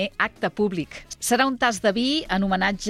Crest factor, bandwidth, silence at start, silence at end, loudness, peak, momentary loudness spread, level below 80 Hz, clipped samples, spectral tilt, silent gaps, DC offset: 16 dB; 15 kHz; 0 s; 0 s; -23 LUFS; -6 dBFS; 7 LU; -48 dBFS; under 0.1%; -3.5 dB/octave; none; under 0.1%